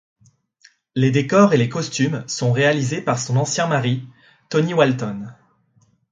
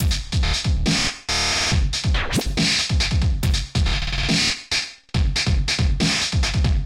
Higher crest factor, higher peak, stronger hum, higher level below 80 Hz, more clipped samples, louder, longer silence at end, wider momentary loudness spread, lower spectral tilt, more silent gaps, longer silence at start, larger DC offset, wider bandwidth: first, 20 dB vs 14 dB; first, 0 dBFS vs -6 dBFS; neither; second, -60 dBFS vs -24 dBFS; neither; about the same, -19 LUFS vs -20 LUFS; first, 0.8 s vs 0 s; first, 12 LU vs 4 LU; first, -5.5 dB/octave vs -3.5 dB/octave; neither; first, 0.95 s vs 0 s; neither; second, 9.4 kHz vs 16 kHz